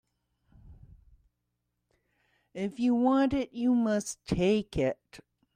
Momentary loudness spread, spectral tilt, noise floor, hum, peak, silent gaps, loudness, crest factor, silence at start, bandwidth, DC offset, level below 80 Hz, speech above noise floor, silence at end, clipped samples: 12 LU; -6 dB/octave; -82 dBFS; 60 Hz at -65 dBFS; -14 dBFS; none; -29 LUFS; 18 dB; 0.65 s; 14.5 kHz; under 0.1%; -54 dBFS; 54 dB; 0.4 s; under 0.1%